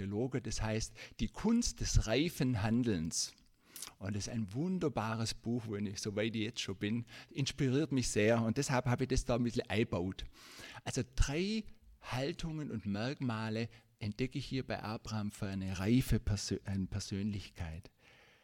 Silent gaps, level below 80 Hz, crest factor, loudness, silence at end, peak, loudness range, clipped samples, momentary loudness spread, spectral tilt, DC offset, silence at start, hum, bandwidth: none; -48 dBFS; 20 dB; -37 LUFS; 0.55 s; -16 dBFS; 5 LU; under 0.1%; 12 LU; -5 dB/octave; under 0.1%; 0 s; none; 17 kHz